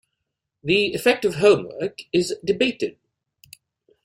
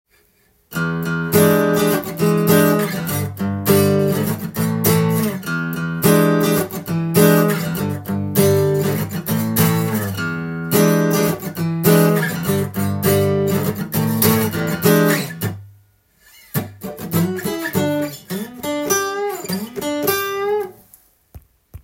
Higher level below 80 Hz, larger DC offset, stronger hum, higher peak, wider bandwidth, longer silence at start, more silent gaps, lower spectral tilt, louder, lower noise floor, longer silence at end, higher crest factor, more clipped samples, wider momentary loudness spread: second, -60 dBFS vs -52 dBFS; neither; neither; second, -4 dBFS vs 0 dBFS; about the same, 15.5 kHz vs 17 kHz; about the same, 0.65 s vs 0.7 s; neither; about the same, -4.5 dB/octave vs -5.5 dB/octave; second, -21 LUFS vs -18 LUFS; first, -80 dBFS vs -58 dBFS; first, 1.15 s vs 0.05 s; about the same, 20 dB vs 18 dB; neither; about the same, 12 LU vs 10 LU